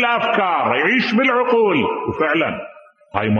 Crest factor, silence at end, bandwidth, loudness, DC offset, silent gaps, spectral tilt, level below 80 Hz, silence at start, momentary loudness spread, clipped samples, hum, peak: 16 dB; 0 s; 6.8 kHz; -17 LUFS; under 0.1%; none; -6.5 dB/octave; -56 dBFS; 0 s; 8 LU; under 0.1%; none; 0 dBFS